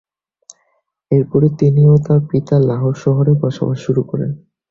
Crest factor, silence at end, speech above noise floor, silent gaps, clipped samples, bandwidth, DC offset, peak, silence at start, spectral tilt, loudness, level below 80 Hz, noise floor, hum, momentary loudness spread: 14 dB; 0.35 s; 52 dB; none; under 0.1%; 7.2 kHz; under 0.1%; 0 dBFS; 1.1 s; -10 dB/octave; -15 LUFS; -48 dBFS; -65 dBFS; none; 10 LU